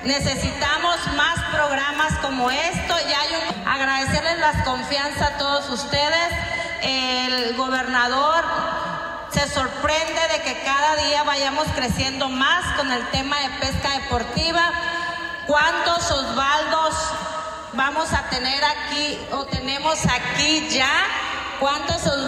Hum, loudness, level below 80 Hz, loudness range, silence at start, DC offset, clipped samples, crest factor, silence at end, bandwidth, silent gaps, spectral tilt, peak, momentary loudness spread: none; -21 LUFS; -40 dBFS; 1 LU; 0 s; under 0.1%; under 0.1%; 16 dB; 0 s; 16 kHz; none; -3 dB/octave; -4 dBFS; 6 LU